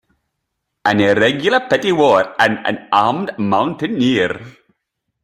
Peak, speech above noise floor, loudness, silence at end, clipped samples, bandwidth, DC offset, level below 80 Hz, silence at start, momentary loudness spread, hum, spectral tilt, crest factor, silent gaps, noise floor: 0 dBFS; 60 dB; -15 LUFS; 0.75 s; under 0.1%; 14 kHz; under 0.1%; -56 dBFS; 0.85 s; 8 LU; none; -5.5 dB/octave; 16 dB; none; -75 dBFS